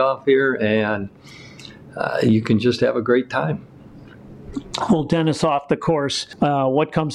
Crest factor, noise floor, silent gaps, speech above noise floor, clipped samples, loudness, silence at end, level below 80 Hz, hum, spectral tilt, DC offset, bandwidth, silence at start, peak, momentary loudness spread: 14 dB; -42 dBFS; none; 23 dB; under 0.1%; -20 LUFS; 0 s; -50 dBFS; none; -6 dB/octave; under 0.1%; 11.5 kHz; 0 s; -6 dBFS; 16 LU